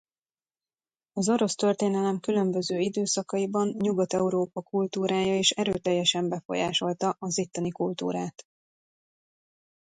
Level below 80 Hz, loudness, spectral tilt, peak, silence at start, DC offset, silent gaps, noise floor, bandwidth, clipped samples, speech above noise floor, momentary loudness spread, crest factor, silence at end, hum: -66 dBFS; -27 LUFS; -4 dB/octave; -8 dBFS; 1.15 s; under 0.1%; 6.45-6.49 s; under -90 dBFS; 9.6 kHz; under 0.1%; over 63 dB; 6 LU; 20 dB; 1.7 s; none